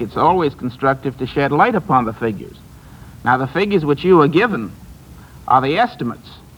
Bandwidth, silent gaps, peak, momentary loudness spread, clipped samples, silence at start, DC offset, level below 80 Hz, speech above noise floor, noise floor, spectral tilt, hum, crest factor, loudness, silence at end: 20 kHz; none; 0 dBFS; 13 LU; under 0.1%; 0 s; under 0.1%; -44 dBFS; 23 dB; -39 dBFS; -7.5 dB/octave; none; 16 dB; -17 LUFS; 0.2 s